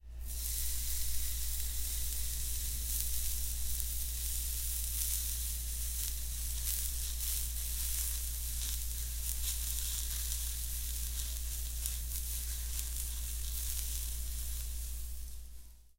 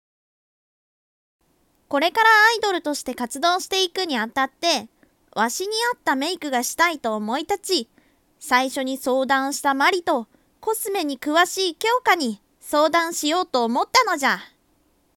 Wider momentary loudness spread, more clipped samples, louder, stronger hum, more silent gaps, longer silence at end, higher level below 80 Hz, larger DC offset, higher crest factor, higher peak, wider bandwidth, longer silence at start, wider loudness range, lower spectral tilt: second, 5 LU vs 9 LU; neither; second, -36 LUFS vs -21 LUFS; neither; neither; second, 0.05 s vs 0.7 s; first, -40 dBFS vs -66 dBFS; neither; first, 26 dB vs 18 dB; second, -10 dBFS vs -4 dBFS; about the same, 17 kHz vs 18 kHz; second, 0.05 s vs 1.9 s; about the same, 3 LU vs 3 LU; about the same, -1 dB/octave vs -1.5 dB/octave